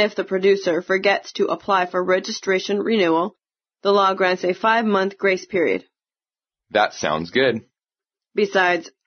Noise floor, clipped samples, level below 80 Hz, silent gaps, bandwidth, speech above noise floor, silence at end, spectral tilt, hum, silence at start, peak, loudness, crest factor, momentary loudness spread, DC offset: under -90 dBFS; under 0.1%; -66 dBFS; none; 6.6 kHz; over 70 dB; 0.2 s; -2.5 dB/octave; none; 0 s; -4 dBFS; -20 LUFS; 18 dB; 6 LU; under 0.1%